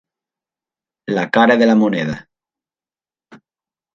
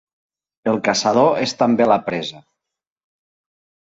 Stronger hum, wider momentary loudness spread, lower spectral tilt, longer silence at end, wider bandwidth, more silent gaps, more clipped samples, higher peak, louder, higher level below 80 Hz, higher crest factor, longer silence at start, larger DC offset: neither; first, 17 LU vs 11 LU; first, -6.5 dB/octave vs -4.5 dB/octave; second, 0.6 s vs 1.45 s; second, 7.4 kHz vs 8.2 kHz; neither; neither; about the same, 0 dBFS vs -2 dBFS; first, -15 LUFS vs -18 LUFS; about the same, -58 dBFS vs -60 dBFS; about the same, 18 dB vs 18 dB; first, 1.1 s vs 0.65 s; neither